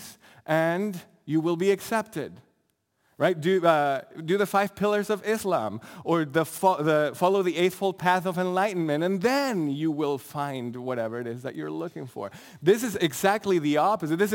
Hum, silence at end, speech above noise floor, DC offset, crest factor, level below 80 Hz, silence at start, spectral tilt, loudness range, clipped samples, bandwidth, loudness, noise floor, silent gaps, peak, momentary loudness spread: none; 0 s; 48 dB; under 0.1%; 20 dB; -70 dBFS; 0 s; -5.5 dB/octave; 4 LU; under 0.1%; 17 kHz; -26 LUFS; -73 dBFS; none; -6 dBFS; 11 LU